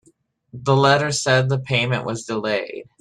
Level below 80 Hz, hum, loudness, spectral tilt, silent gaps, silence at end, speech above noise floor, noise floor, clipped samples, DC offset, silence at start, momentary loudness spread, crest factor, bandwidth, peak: -56 dBFS; none; -20 LUFS; -4.5 dB/octave; none; 0.2 s; 40 dB; -60 dBFS; under 0.1%; under 0.1%; 0.55 s; 10 LU; 18 dB; 11.5 kHz; -4 dBFS